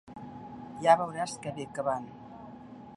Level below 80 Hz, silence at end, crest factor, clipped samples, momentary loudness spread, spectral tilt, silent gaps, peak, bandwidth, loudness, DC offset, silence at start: -66 dBFS; 0 s; 24 dB; under 0.1%; 23 LU; -5 dB/octave; none; -10 dBFS; 11.5 kHz; -30 LUFS; under 0.1%; 0.05 s